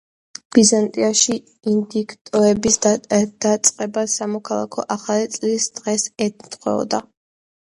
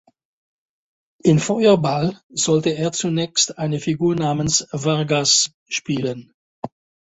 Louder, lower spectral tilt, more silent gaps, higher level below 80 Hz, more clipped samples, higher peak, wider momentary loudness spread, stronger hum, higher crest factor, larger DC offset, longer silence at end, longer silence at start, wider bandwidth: about the same, -19 LUFS vs -19 LUFS; about the same, -3.5 dB/octave vs -4 dB/octave; second, 2.21-2.25 s vs 2.23-2.29 s, 5.54-5.66 s, 6.34-6.63 s; about the same, -56 dBFS vs -54 dBFS; neither; about the same, 0 dBFS vs -2 dBFS; about the same, 10 LU vs 11 LU; neither; about the same, 20 dB vs 18 dB; neither; first, 0.75 s vs 0.35 s; second, 0.55 s vs 1.25 s; first, 11.5 kHz vs 8.4 kHz